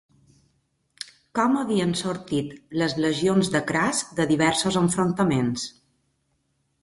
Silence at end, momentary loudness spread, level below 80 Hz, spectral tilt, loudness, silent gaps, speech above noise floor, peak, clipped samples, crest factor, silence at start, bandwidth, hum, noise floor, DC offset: 1.15 s; 10 LU; -58 dBFS; -4.5 dB/octave; -23 LUFS; none; 48 dB; -8 dBFS; under 0.1%; 18 dB; 1.35 s; 11.5 kHz; none; -71 dBFS; under 0.1%